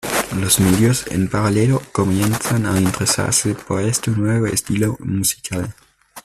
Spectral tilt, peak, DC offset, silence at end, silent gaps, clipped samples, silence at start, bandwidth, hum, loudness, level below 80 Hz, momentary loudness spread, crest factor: -4.5 dB/octave; 0 dBFS; under 0.1%; 0.05 s; none; under 0.1%; 0.05 s; 16 kHz; none; -18 LUFS; -44 dBFS; 6 LU; 18 dB